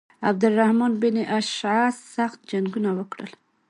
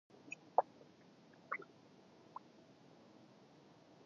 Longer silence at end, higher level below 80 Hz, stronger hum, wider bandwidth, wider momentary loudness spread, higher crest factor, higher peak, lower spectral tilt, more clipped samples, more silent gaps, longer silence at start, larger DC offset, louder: second, 0.4 s vs 2.4 s; first, -72 dBFS vs under -90 dBFS; neither; first, 10.5 kHz vs 7.2 kHz; second, 10 LU vs 26 LU; second, 18 dB vs 32 dB; first, -6 dBFS vs -16 dBFS; first, -5.5 dB/octave vs -3 dB/octave; neither; neither; about the same, 0.2 s vs 0.25 s; neither; first, -23 LUFS vs -44 LUFS